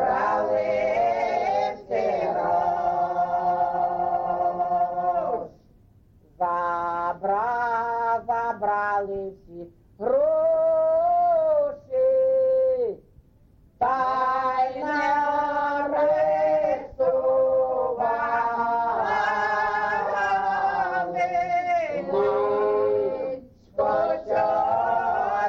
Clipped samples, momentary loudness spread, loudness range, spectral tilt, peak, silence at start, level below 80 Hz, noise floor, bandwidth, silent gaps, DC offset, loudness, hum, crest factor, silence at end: under 0.1%; 6 LU; 4 LU; -6 dB/octave; -12 dBFS; 0 s; -56 dBFS; -56 dBFS; 7 kHz; none; under 0.1%; -24 LUFS; none; 12 dB; 0 s